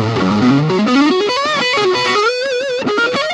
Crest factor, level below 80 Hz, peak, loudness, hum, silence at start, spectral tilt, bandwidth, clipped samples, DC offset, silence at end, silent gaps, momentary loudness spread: 12 dB; -52 dBFS; -2 dBFS; -14 LUFS; none; 0 s; -5 dB/octave; 11 kHz; under 0.1%; under 0.1%; 0 s; none; 5 LU